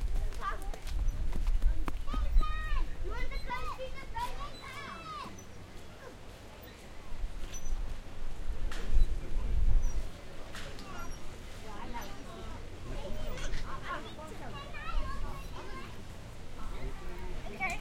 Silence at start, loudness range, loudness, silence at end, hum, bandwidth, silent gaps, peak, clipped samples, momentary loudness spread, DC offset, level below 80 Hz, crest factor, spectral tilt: 0 s; 8 LU; -41 LUFS; 0 s; none; 12 kHz; none; -12 dBFS; under 0.1%; 13 LU; under 0.1%; -34 dBFS; 20 dB; -5 dB/octave